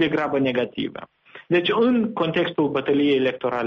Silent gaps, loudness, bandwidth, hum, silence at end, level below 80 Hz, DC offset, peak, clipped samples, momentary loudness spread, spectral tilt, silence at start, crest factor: none; -22 LUFS; 6.6 kHz; none; 0 s; -60 dBFS; under 0.1%; -8 dBFS; under 0.1%; 8 LU; -7.5 dB/octave; 0 s; 14 dB